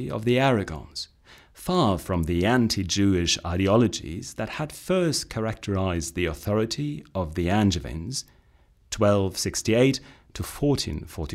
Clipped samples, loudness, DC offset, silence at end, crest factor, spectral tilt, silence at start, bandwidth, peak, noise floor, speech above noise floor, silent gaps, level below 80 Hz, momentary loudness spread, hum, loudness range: under 0.1%; -25 LUFS; under 0.1%; 0 s; 18 dB; -5 dB/octave; 0 s; 16 kHz; -6 dBFS; -59 dBFS; 34 dB; none; -44 dBFS; 12 LU; none; 4 LU